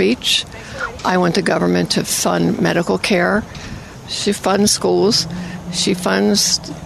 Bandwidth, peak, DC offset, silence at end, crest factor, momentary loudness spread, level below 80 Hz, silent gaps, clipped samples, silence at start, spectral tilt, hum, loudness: 15 kHz; -2 dBFS; under 0.1%; 0 s; 14 dB; 12 LU; -44 dBFS; none; under 0.1%; 0 s; -3.5 dB/octave; none; -16 LUFS